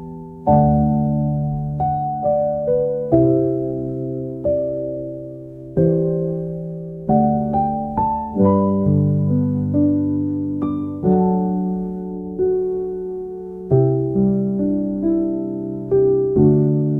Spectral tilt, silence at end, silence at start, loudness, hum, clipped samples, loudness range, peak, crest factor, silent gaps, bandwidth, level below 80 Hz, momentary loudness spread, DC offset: -13.5 dB/octave; 0 s; 0 s; -19 LUFS; none; under 0.1%; 3 LU; -2 dBFS; 16 dB; none; 2.4 kHz; -42 dBFS; 11 LU; 0.1%